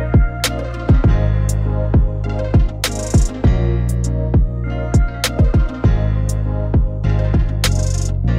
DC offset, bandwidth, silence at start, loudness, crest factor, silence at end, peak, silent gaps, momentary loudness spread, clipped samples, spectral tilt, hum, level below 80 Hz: under 0.1%; 16 kHz; 0 s; -17 LUFS; 14 dB; 0 s; 0 dBFS; none; 5 LU; under 0.1%; -6 dB/octave; none; -18 dBFS